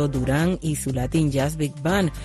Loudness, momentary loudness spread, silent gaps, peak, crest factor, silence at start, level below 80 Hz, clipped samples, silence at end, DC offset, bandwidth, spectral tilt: -23 LUFS; 4 LU; none; -10 dBFS; 14 dB; 0 s; -38 dBFS; under 0.1%; 0 s; under 0.1%; 14 kHz; -6 dB/octave